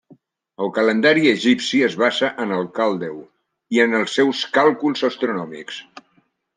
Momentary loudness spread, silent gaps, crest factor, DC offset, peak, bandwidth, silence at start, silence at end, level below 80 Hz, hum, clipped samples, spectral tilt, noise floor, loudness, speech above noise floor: 15 LU; none; 18 dB; under 0.1%; -2 dBFS; 9.8 kHz; 0.6 s; 0.55 s; -72 dBFS; none; under 0.1%; -4.5 dB/octave; -63 dBFS; -18 LUFS; 44 dB